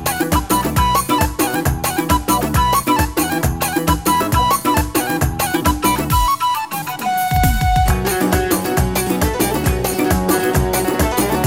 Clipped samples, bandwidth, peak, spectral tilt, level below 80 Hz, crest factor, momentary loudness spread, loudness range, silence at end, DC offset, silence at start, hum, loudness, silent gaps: under 0.1%; 16.5 kHz; -2 dBFS; -4.5 dB/octave; -24 dBFS; 14 dB; 3 LU; 1 LU; 0 s; 0.3%; 0 s; none; -17 LUFS; none